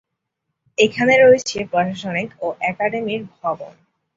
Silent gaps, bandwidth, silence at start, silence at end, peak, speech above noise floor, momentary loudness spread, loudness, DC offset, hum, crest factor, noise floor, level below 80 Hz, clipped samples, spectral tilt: none; 7.8 kHz; 0.8 s; 0.45 s; -2 dBFS; 60 dB; 14 LU; -18 LUFS; under 0.1%; none; 18 dB; -78 dBFS; -58 dBFS; under 0.1%; -4.5 dB/octave